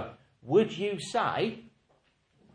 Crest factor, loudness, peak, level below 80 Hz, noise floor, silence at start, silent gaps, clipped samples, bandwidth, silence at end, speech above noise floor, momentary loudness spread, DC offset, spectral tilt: 20 dB; -29 LUFS; -12 dBFS; -70 dBFS; -69 dBFS; 0 s; none; under 0.1%; 10 kHz; 0.85 s; 41 dB; 14 LU; under 0.1%; -5.5 dB/octave